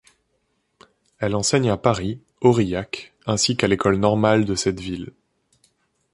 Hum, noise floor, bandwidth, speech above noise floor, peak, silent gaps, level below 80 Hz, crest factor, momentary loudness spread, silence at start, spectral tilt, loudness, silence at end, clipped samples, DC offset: none; -70 dBFS; 11.5 kHz; 50 dB; 0 dBFS; none; -48 dBFS; 22 dB; 12 LU; 1.2 s; -5 dB/octave; -21 LUFS; 1.05 s; under 0.1%; under 0.1%